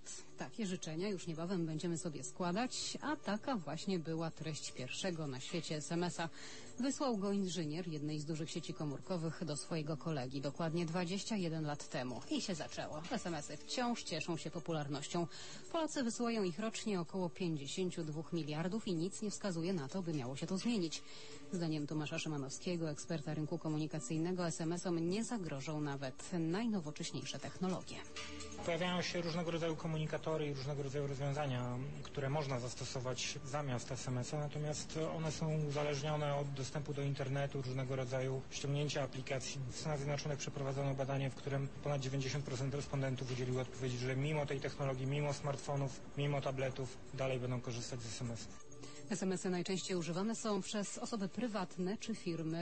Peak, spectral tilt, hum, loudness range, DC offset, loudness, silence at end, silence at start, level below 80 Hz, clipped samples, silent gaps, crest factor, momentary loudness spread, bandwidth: -26 dBFS; -5 dB/octave; none; 2 LU; 0.3%; -41 LUFS; 0 s; 0 s; -66 dBFS; under 0.1%; none; 14 dB; 6 LU; 8.4 kHz